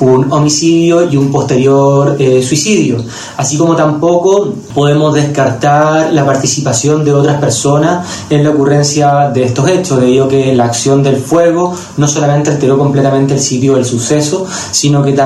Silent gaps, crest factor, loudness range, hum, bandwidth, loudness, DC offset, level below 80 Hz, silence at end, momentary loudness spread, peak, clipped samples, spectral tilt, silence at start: none; 8 dB; 1 LU; none; 12.5 kHz; -10 LUFS; under 0.1%; -46 dBFS; 0 s; 4 LU; 0 dBFS; 0.1%; -5.5 dB/octave; 0 s